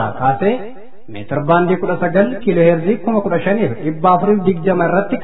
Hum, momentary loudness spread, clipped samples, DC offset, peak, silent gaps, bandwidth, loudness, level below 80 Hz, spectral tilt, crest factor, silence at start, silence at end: none; 9 LU; under 0.1%; 4%; 0 dBFS; none; 4.1 kHz; -15 LUFS; -48 dBFS; -12 dB/octave; 14 dB; 0 s; 0 s